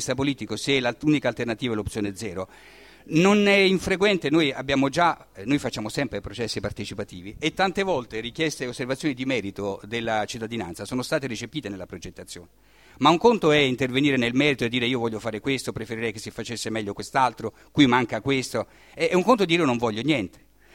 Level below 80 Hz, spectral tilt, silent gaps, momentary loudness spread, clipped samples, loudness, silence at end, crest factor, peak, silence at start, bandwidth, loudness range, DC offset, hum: -52 dBFS; -5 dB/octave; none; 14 LU; under 0.1%; -24 LUFS; 0.45 s; 20 dB; -4 dBFS; 0 s; 16.5 kHz; 6 LU; under 0.1%; none